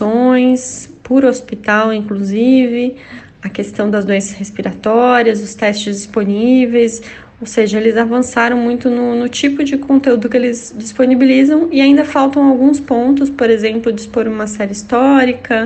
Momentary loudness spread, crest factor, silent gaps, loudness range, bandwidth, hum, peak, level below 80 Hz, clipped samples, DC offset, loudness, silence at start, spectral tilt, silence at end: 11 LU; 12 dB; none; 4 LU; 8.8 kHz; none; 0 dBFS; -50 dBFS; under 0.1%; under 0.1%; -12 LUFS; 0 s; -5 dB/octave; 0 s